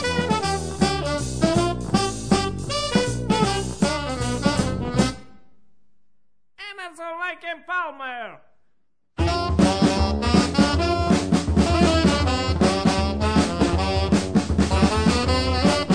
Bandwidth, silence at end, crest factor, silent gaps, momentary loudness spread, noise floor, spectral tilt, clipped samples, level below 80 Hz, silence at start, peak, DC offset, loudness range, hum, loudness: 10.5 kHz; 0 s; 18 dB; none; 10 LU; -67 dBFS; -5.5 dB/octave; under 0.1%; -32 dBFS; 0 s; -4 dBFS; 0.5%; 11 LU; none; -21 LUFS